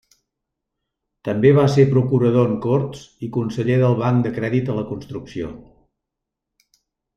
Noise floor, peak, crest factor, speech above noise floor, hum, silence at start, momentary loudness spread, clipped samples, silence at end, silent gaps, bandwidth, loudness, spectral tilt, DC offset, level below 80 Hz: -82 dBFS; -2 dBFS; 18 dB; 64 dB; none; 1.25 s; 16 LU; under 0.1%; 1.55 s; none; 7.8 kHz; -19 LUFS; -8.5 dB/octave; under 0.1%; -52 dBFS